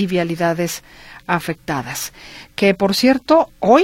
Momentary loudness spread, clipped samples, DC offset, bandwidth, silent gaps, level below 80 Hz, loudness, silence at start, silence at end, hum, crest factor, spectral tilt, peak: 15 LU; under 0.1%; under 0.1%; 16.5 kHz; none; -50 dBFS; -18 LUFS; 0 s; 0 s; none; 18 dB; -5 dB/octave; 0 dBFS